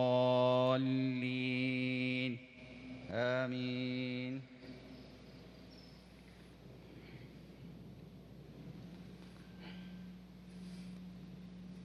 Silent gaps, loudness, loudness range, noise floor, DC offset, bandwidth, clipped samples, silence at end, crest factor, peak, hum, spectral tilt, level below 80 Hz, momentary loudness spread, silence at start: none; -36 LUFS; 19 LU; -57 dBFS; under 0.1%; 10 kHz; under 0.1%; 0 s; 20 dB; -20 dBFS; none; -7.5 dB/octave; -68 dBFS; 23 LU; 0 s